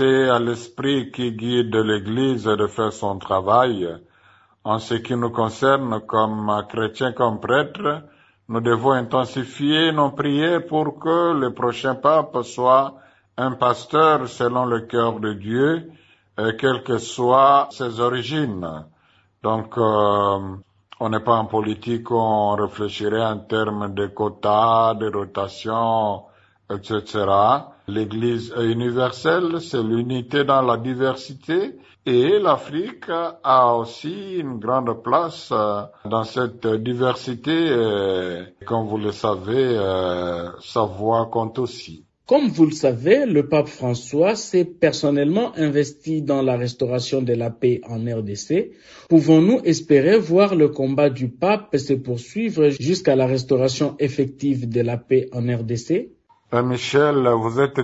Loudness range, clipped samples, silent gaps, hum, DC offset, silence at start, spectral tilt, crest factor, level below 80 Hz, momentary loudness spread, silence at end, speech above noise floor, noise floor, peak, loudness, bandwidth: 4 LU; under 0.1%; none; none; under 0.1%; 0 s; -6 dB/octave; 18 dB; -60 dBFS; 10 LU; 0 s; 39 dB; -59 dBFS; -2 dBFS; -20 LUFS; 8 kHz